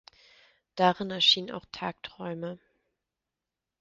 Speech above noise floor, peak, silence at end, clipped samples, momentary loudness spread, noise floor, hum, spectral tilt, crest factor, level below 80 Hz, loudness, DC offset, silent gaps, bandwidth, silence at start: 60 dB; -10 dBFS; 1.25 s; under 0.1%; 18 LU; -89 dBFS; none; -1.5 dB/octave; 22 dB; -70 dBFS; -27 LUFS; under 0.1%; none; 7.4 kHz; 0.75 s